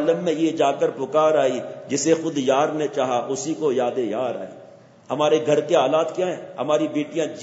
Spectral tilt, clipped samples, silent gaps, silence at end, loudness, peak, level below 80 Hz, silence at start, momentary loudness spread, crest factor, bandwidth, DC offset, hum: -4.5 dB/octave; under 0.1%; none; 0 s; -22 LUFS; -4 dBFS; -74 dBFS; 0 s; 8 LU; 18 dB; 8 kHz; under 0.1%; none